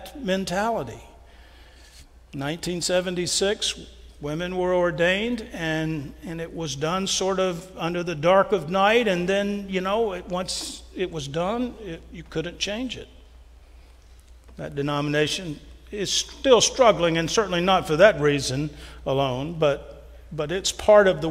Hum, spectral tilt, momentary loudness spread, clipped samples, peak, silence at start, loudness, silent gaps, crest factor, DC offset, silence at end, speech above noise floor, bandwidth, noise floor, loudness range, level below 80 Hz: none; -4 dB/octave; 16 LU; under 0.1%; -2 dBFS; 0 s; -23 LUFS; none; 22 dB; under 0.1%; 0 s; 26 dB; 16 kHz; -49 dBFS; 10 LU; -46 dBFS